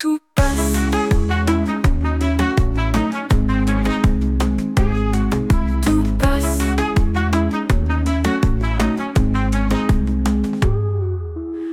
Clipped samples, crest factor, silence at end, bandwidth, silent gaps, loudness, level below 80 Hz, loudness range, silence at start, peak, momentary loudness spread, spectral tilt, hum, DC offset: under 0.1%; 12 dB; 0 s; 17 kHz; none; -19 LUFS; -20 dBFS; 1 LU; 0 s; -4 dBFS; 2 LU; -6.5 dB/octave; none; under 0.1%